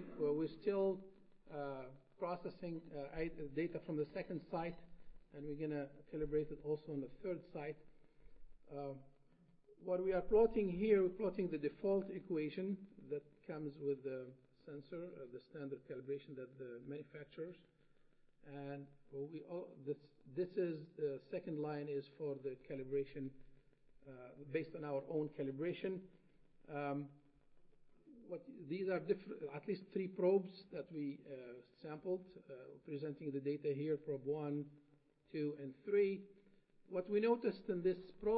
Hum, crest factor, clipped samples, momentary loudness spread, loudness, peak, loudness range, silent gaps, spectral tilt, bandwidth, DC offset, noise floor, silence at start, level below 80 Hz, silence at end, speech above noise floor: none; 22 dB; under 0.1%; 16 LU; -43 LUFS; -22 dBFS; 12 LU; none; -7 dB/octave; 5 kHz; under 0.1%; -73 dBFS; 0 s; -66 dBFS; 0 s; 30 dB